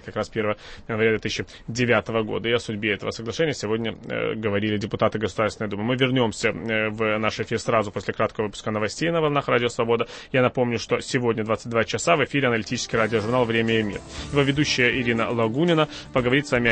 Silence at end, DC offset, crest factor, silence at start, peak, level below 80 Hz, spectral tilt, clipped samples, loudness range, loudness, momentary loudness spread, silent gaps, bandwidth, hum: 0 s; under 0.1%; 18 dB; 0 s; -4 dBFS; -50 dBFS; -5 dB/octave; under 0.1%; 3 LU; -23 LUFS; 7 LU; none; 8.8 kHz; none